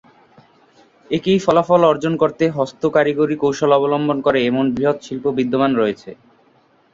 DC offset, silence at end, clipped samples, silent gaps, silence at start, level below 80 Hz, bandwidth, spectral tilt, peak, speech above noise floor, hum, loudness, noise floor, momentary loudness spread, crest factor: under 0.1%; 0.8 s; under 0.1%; none; 1.1 s; -56 dBFS; 7.8 kHz; -6.5 dB/octave; -2 dBFS; 39 dB; none; -17 LUFS; -56 dBFS; 7 LU; 16 dB